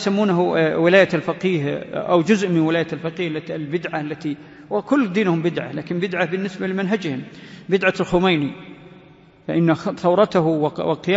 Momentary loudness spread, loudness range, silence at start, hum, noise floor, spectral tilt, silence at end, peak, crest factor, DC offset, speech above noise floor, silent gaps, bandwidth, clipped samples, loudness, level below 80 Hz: 11 LU; 4 LU; 0 s; none; -48 dBFS; -6.5 dB/octave; 0 s; -2 dBFS; 18 dB; under 0.1%; 28 dB; none; 8 kHz; under 0.1%; -20 LUFS; -54 dBFS